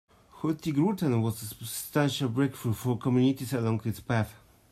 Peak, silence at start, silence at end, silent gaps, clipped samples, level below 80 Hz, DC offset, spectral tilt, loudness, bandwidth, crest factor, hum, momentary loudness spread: -12 dBFS; 0.35 s; 0.35 s; none; under 0.1%; -62 dBFS; under 0.1%; -6 dB/octave; -29 LUFS; 15.5 kHz; 16 dB; none; 9 LU